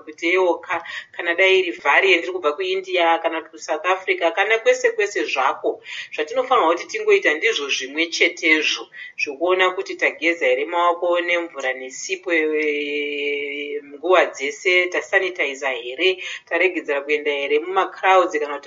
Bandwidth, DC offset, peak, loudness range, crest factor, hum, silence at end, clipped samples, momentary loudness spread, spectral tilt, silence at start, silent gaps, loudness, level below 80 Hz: 7.6 kHz; under 0.1%; -2 dBFS; 2 LU; 18 dB; none; 0 s; under 0.1%; 10 LU; 2 dB/octave; 0.05 s; none; -19 LUFS; -80 dBFS